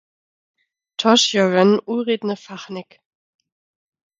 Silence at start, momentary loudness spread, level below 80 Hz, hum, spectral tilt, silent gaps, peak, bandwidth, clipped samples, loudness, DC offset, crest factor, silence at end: 1 s; 19 LU; -72 dBFS; none; -4 dB/octave; none; 0 dBFS; 9.4 kHz; under 0.1%; -17 LUFS; under 0.1%; 20 dB; 1.4 s